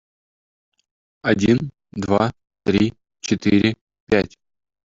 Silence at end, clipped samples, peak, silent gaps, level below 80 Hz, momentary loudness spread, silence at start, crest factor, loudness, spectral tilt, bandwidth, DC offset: 0.65 s; under 0.1%; -2 dBFS; 3.81-3.87 s, 4.00-4.07 s; -50 dBFS; 13 LU; 1.25 s; 18 dB; -21 LUFS; -6 dB/octave; 7.8 kHz; under 0.1%